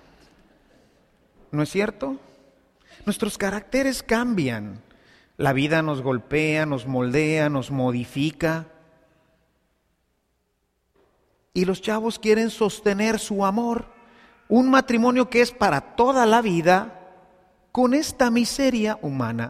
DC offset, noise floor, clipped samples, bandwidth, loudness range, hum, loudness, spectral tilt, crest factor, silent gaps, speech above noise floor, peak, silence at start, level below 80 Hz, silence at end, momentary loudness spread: under 0.1%; -72 dBFS; under 0.1%; 15 kHz; 10 LU; none; -22 LUFS; -5.5 dB/octave; 20 dB; none; 50 dB; -4 dBFS; 1.5 s; -52 dBFS; 0 s; 10 LU